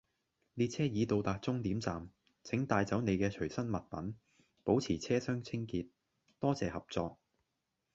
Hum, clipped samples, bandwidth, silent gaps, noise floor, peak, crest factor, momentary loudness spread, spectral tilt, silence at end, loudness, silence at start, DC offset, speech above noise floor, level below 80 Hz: none; under 0.1%; 8 kHz; none; -85 dBFS; -16 dBFS; 22 dB; 12 LU; -6.5 dB/octave; 0.8 s; -36 LUFS; 0.55 s; under 0.1%; 50 dB; -60 dBFS